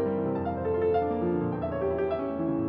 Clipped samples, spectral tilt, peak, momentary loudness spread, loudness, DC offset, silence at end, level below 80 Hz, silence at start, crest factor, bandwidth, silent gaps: under 0.1%; -8 dB/octave; -16 dBFS; 4 LU; -29 LUFS; under 0.1%; 0 s; -52 dBFS; 0 s; 12 dB; 5 kHz; none